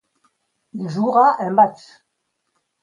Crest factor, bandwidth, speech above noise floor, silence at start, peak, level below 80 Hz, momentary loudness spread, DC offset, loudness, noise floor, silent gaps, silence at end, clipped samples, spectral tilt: 18 dB; 10 kHz; 57 dB; 0.75 s; -2 dBFS; -72 dBFS; 15 LU; under 0.1%; -17 LUFS; -74 dBFS; none; 1.1 s; under 0.1%; -7.5 dB/octave